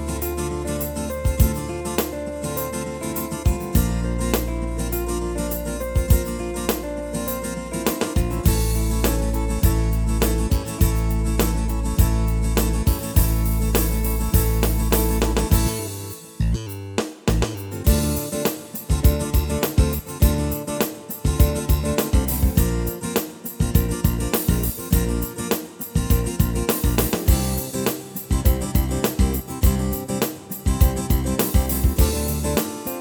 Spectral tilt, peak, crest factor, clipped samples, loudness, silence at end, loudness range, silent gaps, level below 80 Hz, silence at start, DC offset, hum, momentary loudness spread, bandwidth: -5.5 dB/octave; -2 dBFS; 18 dB; under 0.1%; -22 LUFS; 0 s; 3 LU; none; -24 dBFS; 0 s; under 0.1%; none; 7 LU; over 20 kHz